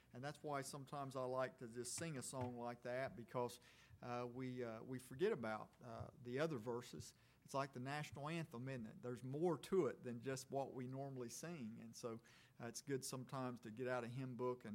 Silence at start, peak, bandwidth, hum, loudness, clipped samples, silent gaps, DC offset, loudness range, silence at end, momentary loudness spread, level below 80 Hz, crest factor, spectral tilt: 0.1 s; -28 dBFS; 16.5 kHz; none; -48 LUFS; under 0.1%; none; under 0.1%; 3 LU; 0 s; 10 LU; -80 dBFS; 20 dB; -5.5 dB/octave